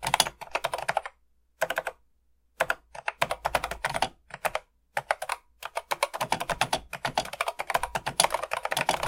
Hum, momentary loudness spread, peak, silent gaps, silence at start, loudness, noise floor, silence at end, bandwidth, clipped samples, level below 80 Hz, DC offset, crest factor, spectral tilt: none; 11 LU; -2 dBFS; none; 0 s; -30 LUFS; -66 dBFS; 0 s; 17 kHz; under 0.1%; -54 dBFS; under 0.1%; 28 dB; -1.5 dB/octave